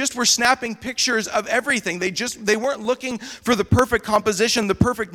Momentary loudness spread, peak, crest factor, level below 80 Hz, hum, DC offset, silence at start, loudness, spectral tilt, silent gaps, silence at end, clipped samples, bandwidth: 7 LU; -2 dBFS; 20 dB; -44 dBFS; none; under 0.1%; 0 s; -20 LUFS; -3 dB/octave; none; 0 s; under 0.1%; 19 kHz